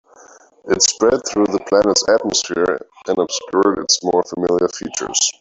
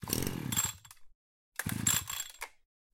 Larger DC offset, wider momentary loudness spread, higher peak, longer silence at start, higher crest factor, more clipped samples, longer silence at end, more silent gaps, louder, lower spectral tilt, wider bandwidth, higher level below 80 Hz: neither; second, 7 LU vs 17 LU; first, 0 dBFS vs -10 dBFS; first, 0.65 s vs 0 s; second, 18 dB vs 26 dB; neither; second, 0.1 s vs 0.45 s; second, none vs 1.15-1.52 s; first, -17 LUFS vs -33 LUFS; about the same, -2 dB/octave vs -2.5 dB/octave; second, 8.2 kHz vs 17 kHz; first, -52 dBFS vs -58 dBFS